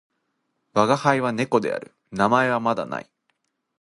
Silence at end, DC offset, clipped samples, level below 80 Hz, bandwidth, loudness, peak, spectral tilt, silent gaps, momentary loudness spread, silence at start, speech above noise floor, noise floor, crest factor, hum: 0.8 s; under 0.1%; under 0.1%; -62 dBFS; 11.5 kHz; -22 LUFS; -2 dBFS; -5.5 dB/octave; none; 13 LU; 0.75 s; 53 dB; -74 dBFS; 22 dB; none